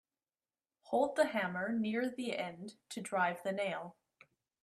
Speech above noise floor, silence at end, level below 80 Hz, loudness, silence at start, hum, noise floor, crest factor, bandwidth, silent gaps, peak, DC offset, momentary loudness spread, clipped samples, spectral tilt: over 54 dB; 0.7 s; -82 dBFS; -36 LUFS; 0.85 s; none; under -90 dBFS; 20 dB; 13.5 kHz; none; -18 dBFS; under 0.1%; 13 LU; under 0.1%; -5 dB/octave